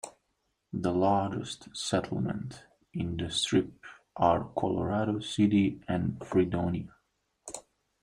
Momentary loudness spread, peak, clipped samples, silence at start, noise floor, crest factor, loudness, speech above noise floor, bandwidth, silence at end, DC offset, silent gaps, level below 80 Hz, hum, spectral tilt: 17 LU; -10 dBFS; under 0.1%; 0.05 s; -78 dBFS; 20 dB; -30 LUFS; 49 dB; 11 kHz; 0.4 s; under 0.1%; none; -58 dBFS; none; -5.5 dB/octave